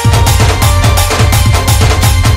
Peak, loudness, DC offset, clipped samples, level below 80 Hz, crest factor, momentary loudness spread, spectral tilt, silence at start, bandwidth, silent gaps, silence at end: 0 dBFS; -9 LUFS; under 0.1%; 0.2%; -14 dBFS; 8 dB; 1 LU; -4 dB/octave; 0 s; 16.5 kHz; none; 0 s